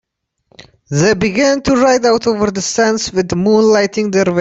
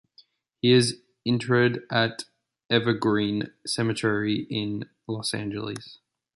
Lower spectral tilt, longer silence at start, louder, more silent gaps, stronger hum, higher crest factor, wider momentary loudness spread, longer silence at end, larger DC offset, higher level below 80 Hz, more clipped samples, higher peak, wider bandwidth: about the same, -4.5 dB/octave vs -5 dB/octave; about the same, 0.6 s vs 0.65 s; first, -13 LUFS vs -25 LUFS; second, none vs 2.65-2.69 s; neither; second, 12 dB vs 20 dB; second, 5 LU vs 13 LU; second, 0 s vs 0.4 s; neither; first, -44 dBFS vs -62 dBFS; neither; first, -2 dBFS vs -6 dBFS; second, 8.2 kHz vs 11.5 kHz